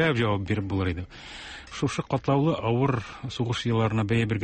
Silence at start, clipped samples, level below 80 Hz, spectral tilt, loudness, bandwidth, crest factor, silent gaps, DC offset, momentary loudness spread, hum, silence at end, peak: 0 s; under 0.1%; -48 dBFS; -6.5 dB/octave; -27 LUFS; 8.8 kHz; 16 dB; none; under 0.1%; 14 LU; none; 0 s; -10 dBFS